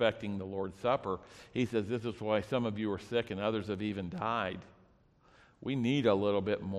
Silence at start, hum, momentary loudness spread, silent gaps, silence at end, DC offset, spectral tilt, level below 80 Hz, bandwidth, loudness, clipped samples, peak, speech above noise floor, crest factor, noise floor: 0 s; none; 10 LU; none; 0 s; under 0.1%; -7 dB/octave; -64 dBFS; 12 kHz; -34 LUFS; under 0.1%; -14 dBFS; 32 dB; 20 dB; -65 dBFS